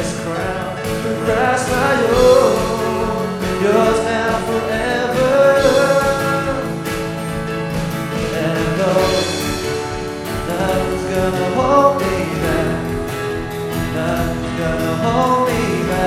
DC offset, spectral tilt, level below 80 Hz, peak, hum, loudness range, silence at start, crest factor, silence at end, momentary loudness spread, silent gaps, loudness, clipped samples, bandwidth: under 0.1%; -5 dB/octave; -34 dBFS; 0 dBFS; none; 4 LU; 0 s; 16 dB; 0 s; 10 LU; none; -17 LUFS; under 0.1%; 16.5 kHz